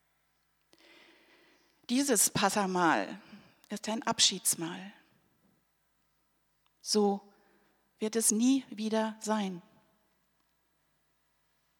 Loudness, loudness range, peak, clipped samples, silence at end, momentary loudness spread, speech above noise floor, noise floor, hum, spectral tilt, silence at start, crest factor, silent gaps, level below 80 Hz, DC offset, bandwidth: -29 LUFS; 7 LU; -10 dBFS; under 0.1%; 2.2 s; 17 LU; 45 dB; -75 dBFS; none; -2.5 dB/octave; 1.9 s; 24 dB; none; -76 dBFS; under 0.1%; 19 kHz